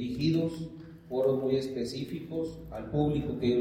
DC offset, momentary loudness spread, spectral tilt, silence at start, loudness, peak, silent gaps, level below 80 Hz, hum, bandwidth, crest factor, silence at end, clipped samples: under 0.1%; 12 LU; -7.5 dB/octave; 0 s; -31 LUFS; -14 dBFS; none; -52 dBFS; none; 16 kHz; 16 dB; 0 s; under 0.1%